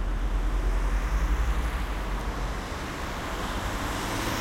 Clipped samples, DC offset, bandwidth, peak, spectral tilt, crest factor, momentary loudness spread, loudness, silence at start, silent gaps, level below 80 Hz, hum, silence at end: under 0.1%; under 0.1%; 16 kHz; -16 dBFS; -5 dB/octave; 12 dB; 5 LU; -31 LUFS; 0 s; none; -28 dBFS; none; 0 s